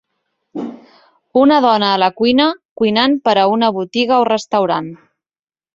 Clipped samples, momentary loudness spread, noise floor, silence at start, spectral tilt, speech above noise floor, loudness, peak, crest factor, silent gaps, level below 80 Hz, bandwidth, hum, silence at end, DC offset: under 0.1%; 16 LU; under -90 dBFS; 0.55 s; -5 dB/octave; over 77 dB; -14 LUFS; -2 dBFS; 14 dB; 2.65-2.76 s; -58 dBFS; 7.6 kHz; none; 0.8 s; under 0.1%